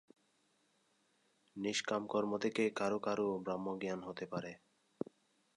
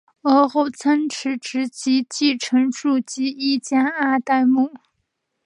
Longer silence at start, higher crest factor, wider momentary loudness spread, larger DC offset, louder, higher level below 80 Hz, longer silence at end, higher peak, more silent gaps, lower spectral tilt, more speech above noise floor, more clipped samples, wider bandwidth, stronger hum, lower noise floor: first, 1.55 s vs 0.25 s; about the same, 18 dB vs 16 dB; first, 12 LU vs 8 LU; neither; second, -39 LUFS vs -20 LUFS; about the same, -80 dBFS vs -76 dBFS; first, 1 s vs 0.7 s; second, -22 dBFS vs -2 dBFS; neither; first, -4.5 dB/octave vs -3 dB/octave; second, 39 dB vs 55 dB; neither; about the same, 11 kHz vs 10.5 kHz; neither; about the same, -77 dBFS vs -74 dBFS